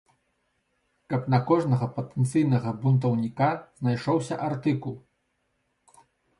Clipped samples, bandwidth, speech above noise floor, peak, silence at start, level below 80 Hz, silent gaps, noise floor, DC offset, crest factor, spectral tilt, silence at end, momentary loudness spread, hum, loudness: under 0.1%; 11.5 kHz; 49 dB; -8 dBFS; 1.1 s; -64 dBFS; none; -74 dBFS; under 0.1%; 18 dB; -8 dB/octave; 1.4 s; 8 LU; none; -26 LUFS